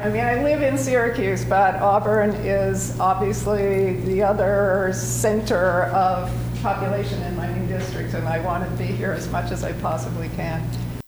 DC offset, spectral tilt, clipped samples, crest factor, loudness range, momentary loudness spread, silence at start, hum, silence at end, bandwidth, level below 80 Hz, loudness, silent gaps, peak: under 0.1%; -6 dB/octave; under 0.1%; 14 dB; 5 LU; 8 LU; 0 s; none; 0.05 s; over 20 kHz; -38 dBFS; -22 LUFS; none; -6 dBFS